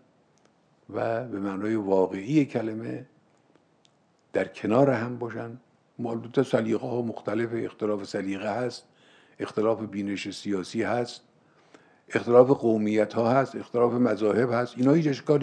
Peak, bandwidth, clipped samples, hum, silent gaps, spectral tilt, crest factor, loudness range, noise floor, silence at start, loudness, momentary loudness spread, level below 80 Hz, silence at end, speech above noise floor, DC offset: -4 dBFS; 9.8 kHz; under 0.1%; none; none; -7 dB/octave; 22 dB; 7 LU; -64 dBFS; 0.9 s; -26 LUFS; 12 LU; -76 dBFS; 0 s; 39 dB; under 0.1%